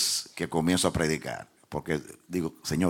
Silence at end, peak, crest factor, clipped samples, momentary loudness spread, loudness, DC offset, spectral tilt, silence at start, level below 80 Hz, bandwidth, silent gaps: 0 s; -8 dBFS; 22 dB; under 0.1%; 13 LU; -29 LUFS; under 0.1%; -4 dB/octave; 0 s; -52 dBFS; 17 kHz; none